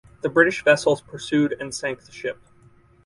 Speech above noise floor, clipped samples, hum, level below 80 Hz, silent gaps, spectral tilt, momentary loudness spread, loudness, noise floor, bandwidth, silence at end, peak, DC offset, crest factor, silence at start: 32 dB; under 0.1%; none; -58 dBFS; none; -4.5 dB/octave; 14 LU; -22 LUFS; -54 dBFS; 11.5 kHz; 0.75 s; -2 dBFS; under 0.1%; 20 dB; 0.25 s